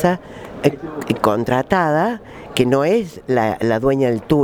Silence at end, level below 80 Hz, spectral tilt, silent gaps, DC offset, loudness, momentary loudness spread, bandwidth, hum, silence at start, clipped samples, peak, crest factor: 0 s; -44 dBFS; -6.5 dB/octave; none; under 0.1%; -18 LUFS; 9 LU; over 20 kHz; none; 0 s; under 0.1%; 0 dBFS; 18 dB